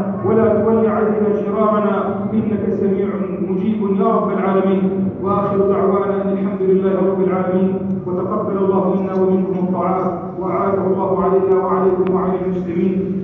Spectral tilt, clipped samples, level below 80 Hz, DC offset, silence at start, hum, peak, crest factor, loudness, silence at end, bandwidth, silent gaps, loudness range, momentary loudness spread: -11.5 dB/octave; under 0.1%; -48 dBFS; under 0.1%; 0 s; none; -2 dBFS; 14 dB; -17 LUFS; 0 s; 3.8 kHz; none; 1 LU; 5 LU